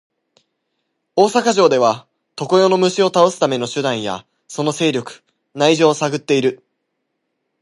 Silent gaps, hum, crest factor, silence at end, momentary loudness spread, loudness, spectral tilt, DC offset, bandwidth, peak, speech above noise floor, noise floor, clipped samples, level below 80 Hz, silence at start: none; none; 16 dB; 1.05 s; 15 LU; -16 LUFS; -4.5 dB/octave; under 0.1%; 11.5 kHz; 0 dBFS; 58 dB; -73 dBFS; under 0.1%; -66 dBFS; 1.15 s